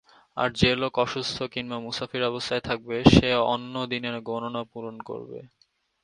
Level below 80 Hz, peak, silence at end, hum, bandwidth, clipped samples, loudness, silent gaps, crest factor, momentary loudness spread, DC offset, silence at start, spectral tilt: -44 dBFS; 0 dBFS; 0.55 s; none; 11 kHz; under 0.1%; -25 LUFS; none; 26 dB; 18 LU; under 0.1%; 0.35 s; -5.5 dB/octave